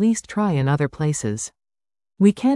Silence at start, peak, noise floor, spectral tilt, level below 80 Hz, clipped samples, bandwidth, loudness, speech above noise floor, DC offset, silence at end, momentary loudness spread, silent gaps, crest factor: 0 s; -4 dBFS; under -90 dBFS; -6.5 dB/octave; -54 dBFS; under 0.1%; 12 kHz; -21 LUFS; over 71 dB; under 0.1%; 0 s; 9 LU; none; 16 dB